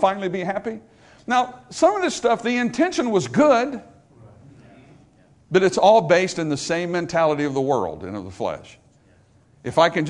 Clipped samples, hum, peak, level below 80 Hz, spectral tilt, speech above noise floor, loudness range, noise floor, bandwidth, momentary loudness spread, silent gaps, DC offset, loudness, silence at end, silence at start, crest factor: under 0.1%; none; -2 dBFS; -60 dBFS; -5 dB/octave; 35 dB; 4 LU; -55 dBFS; 11 kHz; 15 LU; none; under 0.1%; -20 LUFS; 0 s; 0 s; 20 dB